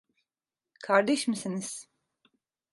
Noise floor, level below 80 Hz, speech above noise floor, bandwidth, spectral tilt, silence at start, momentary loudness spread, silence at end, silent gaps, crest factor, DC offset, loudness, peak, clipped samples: under -90 dBFS; -82 dBFS; over 62 dB; 11.5 kHz; -4 dB/octave; 0.8 s; 17 LU; 0.9 s; none; 24 dB; under 0.1%; -28 LUFS; -8 dBFS; under 0.1%